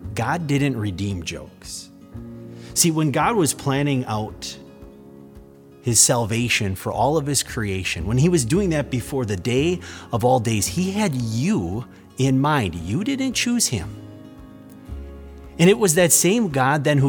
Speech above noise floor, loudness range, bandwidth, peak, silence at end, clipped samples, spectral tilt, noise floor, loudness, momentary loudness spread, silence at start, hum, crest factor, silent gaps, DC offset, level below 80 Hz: 24 dB; 3 LU; over 20 kHz; -2 dBFS; 0 s; under 0.1%; -4.5 dB/octave; -45 dBFS; -20 LUFS; 21 LU; 0 s; none; 20 dB; none; under 0.1%; -44 dBFS